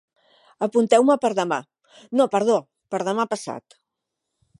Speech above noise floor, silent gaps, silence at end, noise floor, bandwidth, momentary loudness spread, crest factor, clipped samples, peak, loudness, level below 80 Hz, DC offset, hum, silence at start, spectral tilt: 61 dB; none; 1 s; -82 dBFS; 11.5 kHz; 13 LU; 20 dB; under 0.1%; -2 dBFS; -22 LUFS; -78 dBFS; under 0.1%; none; 0.6 s; -5 dB/octave